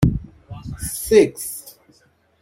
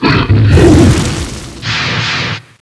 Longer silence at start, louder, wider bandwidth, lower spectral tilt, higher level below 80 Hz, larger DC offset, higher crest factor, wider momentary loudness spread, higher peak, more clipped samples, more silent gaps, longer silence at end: about the same, 0 s vs 0 s; second, -20 LUFS vs -10 LUFS; first, 16.5 kHz vs 11 kHz; about the same, -6 dB/octave vs -5.5 dB/octave; second, -38 dBFS vs -20 dBFS; neither; first, 20 dB vs 10 dB; first, 20 LU vs 13 LU; about the same, -2 dBFS vs 0 dBFS; second, under 0.1% vs 1%; neither; first, 0.7 s vs 0.2 s